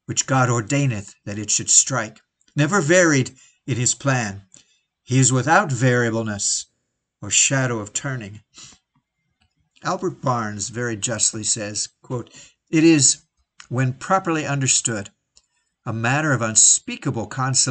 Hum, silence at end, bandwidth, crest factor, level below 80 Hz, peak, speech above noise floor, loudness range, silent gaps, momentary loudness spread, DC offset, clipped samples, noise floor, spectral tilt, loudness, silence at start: none; 0 s; 9.6 kHz; 20 dB; -60 dBFS; 0 dBFS; 55 dB; 5 LU; none; 16 LU; under 0.1%; under 0.1%; -75 dBFS; -3.5 dB/octave; -19 LUFS; 0.1 s